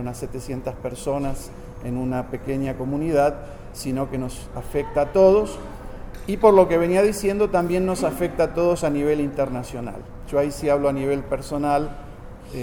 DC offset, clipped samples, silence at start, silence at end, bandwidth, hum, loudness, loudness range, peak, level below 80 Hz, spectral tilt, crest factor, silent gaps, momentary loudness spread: under 0.1%; under 0.1%; 0 s; 0 s; over 20 kHz; none; -22 LUFS; 7 LU; -2 dBFS; -38 dBFS; -6.5 dB/octave; 20 dB; none; 19 LU